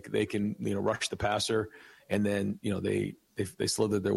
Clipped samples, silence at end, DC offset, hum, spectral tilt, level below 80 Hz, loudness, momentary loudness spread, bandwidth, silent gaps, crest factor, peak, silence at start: under 0.1%; 0 s; under 0.1%; none; -5 dB/octave; -60 dBFS; -31 LUFS; 7 LU; 14.5 kHz; none; 16 dB; -16 dBFS; 0.05 s